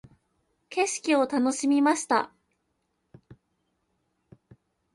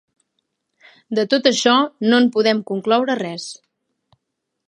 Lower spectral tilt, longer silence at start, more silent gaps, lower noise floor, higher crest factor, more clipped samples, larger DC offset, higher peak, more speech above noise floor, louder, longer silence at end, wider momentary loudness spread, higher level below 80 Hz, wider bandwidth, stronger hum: about the same, -3 dB/octave vs -3.5 dB/octave; second, 0.7 s vs 1.1 s; neither; about the same, -76 dBFS vs -77 dBFS; about the same, 18 dB vs 18 dB; neither; neither; second, -10 dBFS vs 0 dBFS; second, 52 dB vs 60 dB; second, -25 LUFS vs -17 LUFS; first, 2.7 s vs 1.15 s; second, 7 LU vs 11 LU; about the same, -72 dBFS vs -74 dBFS; about the same, 11.5 kHz vs 11 kHz; neither